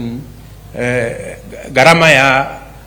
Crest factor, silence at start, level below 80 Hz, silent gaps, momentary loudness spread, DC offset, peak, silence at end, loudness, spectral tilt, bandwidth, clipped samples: 14 dB; 0 s; -38 dBFS; none; 22 LU; under 0.1%; 0 dBFS; 0 s; -10 LUFS; -4.5 dB/octave; over 20 kHz; 0.5%